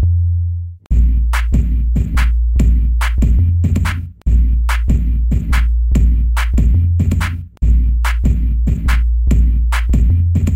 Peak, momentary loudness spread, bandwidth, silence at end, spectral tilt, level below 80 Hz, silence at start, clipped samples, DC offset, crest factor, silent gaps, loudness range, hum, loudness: -2 dBFS; 4 LU; 11 kHz; 0 s; -6.5 dB/octave; -14 dBFS; 0 s; under 0.1%; under 0.1%; 10 dB; none; 1 LU; none; -16 LUFS